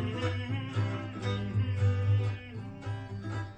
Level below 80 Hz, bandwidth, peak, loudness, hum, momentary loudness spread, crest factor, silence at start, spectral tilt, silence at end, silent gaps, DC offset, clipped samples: -56 dBFS; 8.2 kHz; -18 dBFS; -33 LUFS; none; 11 LU; 14 dB; 0 s; -7.5 dB/octave; 0 s; none; under 0.1%; under 0.1%